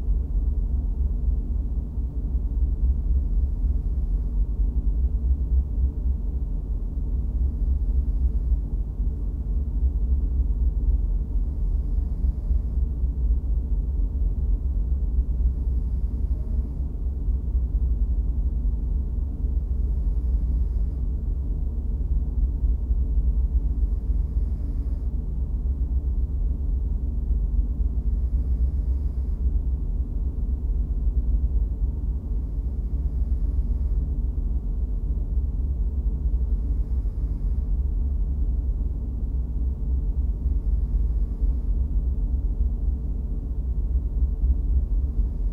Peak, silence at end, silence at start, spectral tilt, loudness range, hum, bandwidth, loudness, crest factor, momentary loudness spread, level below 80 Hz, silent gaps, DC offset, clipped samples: -12 dBFS; 0 s; 0 s; -11.5 dB/octave; 1 LU; none; 1.2 kHz; -27 LUFS; 12 dB; 4 LU; -24 dBFS; none; under 0.1%; under 0.1%